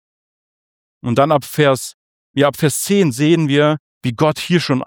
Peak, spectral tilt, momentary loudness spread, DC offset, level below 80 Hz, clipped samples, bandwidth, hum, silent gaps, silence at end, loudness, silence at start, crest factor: -2 dBFS; -5.5 dB/octave; 9 LU; under 0.1%; -58 dBFS; under 0.1%; 19.5 kHz; none; 1.94-2.34 s, 3.79-4.01 s; 0 s; -16 LUFS; 1.05 s; 16 dB